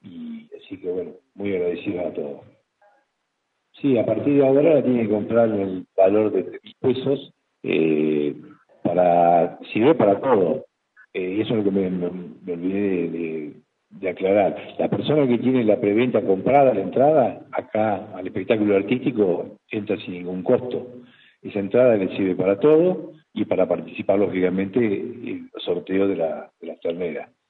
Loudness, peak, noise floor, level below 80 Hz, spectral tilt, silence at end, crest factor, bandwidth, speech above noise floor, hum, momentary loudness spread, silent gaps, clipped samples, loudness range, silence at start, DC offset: -21 LUFS; -4 dBFS; -75 dBFS; -66 dBFS; -10.5 dB/octave; 0.25 s; 16 dB; 4.3 kHz; 54 dB; none; 15 LU; none; under 0.1%; 5 LU; 0.05 s; under 0.1%